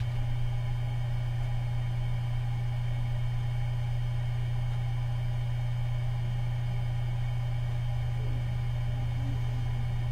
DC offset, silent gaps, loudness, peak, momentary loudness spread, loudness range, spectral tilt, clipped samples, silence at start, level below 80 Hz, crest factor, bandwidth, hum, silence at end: under 0.1%; none; -32 LUFS; -20 dBFS; 0 LU; 0 LU; -7.5 dB/octave; under 0.1%; 0 s; -36 dBFS; 10 dB; 9.2 kHz; none; 0 s